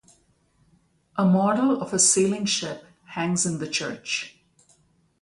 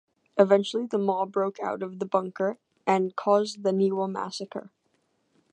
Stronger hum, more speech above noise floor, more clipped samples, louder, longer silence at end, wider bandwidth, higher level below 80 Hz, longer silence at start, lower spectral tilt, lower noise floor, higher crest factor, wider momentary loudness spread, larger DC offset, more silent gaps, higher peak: neither; second, 41 dB vs 46 dB; neither; first, -23 LUFS vs -27 LUFS; about the same, 0.95 s vs 0.9 s; first, 11.5 kHz vs 9.4 kHz; first, -64 dBFS vs -82 dBFS; first, 1.15 s vs 0.35 s; second, -3.5 dB/octave vs -6 dB/octave; second, -64 dBFS vs -72 dBFS; about the same, 18 dB vs 22 dB; first, 17 LU vs 11 LU; neither; neither; about the same, -6 dBFS vs -4 dBFS